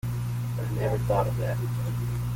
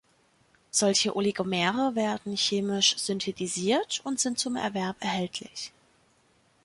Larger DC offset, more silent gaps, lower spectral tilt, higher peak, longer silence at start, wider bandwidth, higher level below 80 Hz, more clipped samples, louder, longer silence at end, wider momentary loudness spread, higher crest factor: neither; neither; first, -7.5 dB/octave vs -3 dB/octave; about the same, -12 dBFS vs -10 dBFS; second, 0.05 s vs 0.75 s; first, 17 kHz vs 11.5 kHz; first, -42 dBFS vs -68 dBFS; neither; about the same, -28 LUFS vs -27 LUFS; second, 0 s vs 0.95 s; second, 5 LU vs 8 LU; about the same, 16 dB vs 20 dB